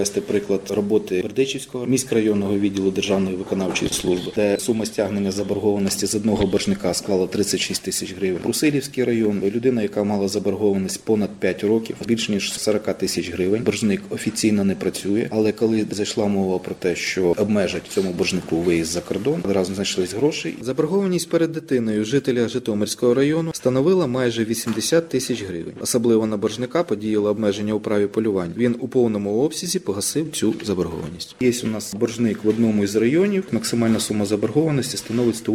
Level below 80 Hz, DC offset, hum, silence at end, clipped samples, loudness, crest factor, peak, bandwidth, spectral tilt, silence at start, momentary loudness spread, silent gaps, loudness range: -52 dBFS; under 0.1%; none; 0 s; under 0.1%; -21 LUFS; 14 dB; -6 dBFS; 17.5 kHz; -5 dB/octave; 0 s; 5 LU; none; 2 LU